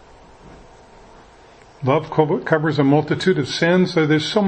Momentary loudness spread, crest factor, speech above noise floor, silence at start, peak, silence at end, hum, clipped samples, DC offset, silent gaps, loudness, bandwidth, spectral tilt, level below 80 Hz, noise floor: 3 LU; 20 dB; 29 dB; 0.45 s; 0 dBFS; 0 s; none; under 0.1%; under 0.1%; none; -18 LUFS; 8.8 kHz; -6.5 dB/octave; -52 dBFS; -46 dBFS